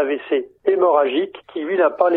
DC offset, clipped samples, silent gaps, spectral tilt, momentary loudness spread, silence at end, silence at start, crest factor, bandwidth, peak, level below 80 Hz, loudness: under 0.1%; under 0.1%; none; -7.5 dB/octave; 9 LU; 0 s; 0 s; 16 dB; 4.1 kHz; -2 dBFS; -68 dBFS; -19 LUFS